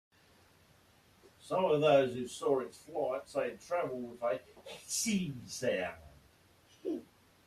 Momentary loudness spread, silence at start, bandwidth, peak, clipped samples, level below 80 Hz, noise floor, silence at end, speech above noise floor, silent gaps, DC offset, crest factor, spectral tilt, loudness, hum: 14 LU; 1.45 s; 14.5 kHz; -16 dBFS; under 0.1%; -72 dBFS; -65 dBFS; 0.45 s; 31 dB; none; under 0.1%; 20 dB; -4 dB/octave; -34 LUFS; none